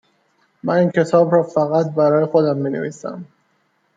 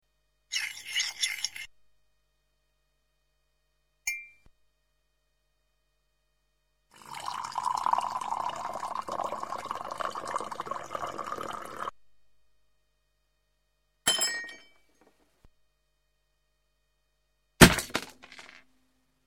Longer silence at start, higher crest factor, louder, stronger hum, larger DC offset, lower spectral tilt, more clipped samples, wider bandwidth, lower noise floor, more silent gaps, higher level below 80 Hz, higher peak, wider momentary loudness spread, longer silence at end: first, 0.65 s vs 0.5 s; second, 16 dB vs 32 dB; first, -17 LUFS vs -29 LUFS; second, none vs 50 Hz at -80 dBFS; neither; first, -8 dB/octave vs -3 dB/octave; neither; second, 7.8 kHz vs 16 kHz; second, -64 dBFS vs -76 dBFS; neither; second, -68 dBFS vs -50 dBFS; about the same, -2 dBFS vs -2 dBFS; about the same, 14 LU vs 15 LU; about the same, 0.7 s vs 0.7 s